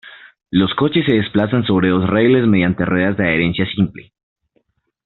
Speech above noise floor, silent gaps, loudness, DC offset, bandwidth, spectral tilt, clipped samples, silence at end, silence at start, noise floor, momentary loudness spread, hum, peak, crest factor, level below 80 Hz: 49 dB; none; -16 LUFS; under 0.1%; 4.3 kHz; -5.5 dB/octave; under 0.1%; 1.05 s; 0.05 s; -64 dBFS; 5 LU; none; 0 dBFS; 16 dB; -46 dBFS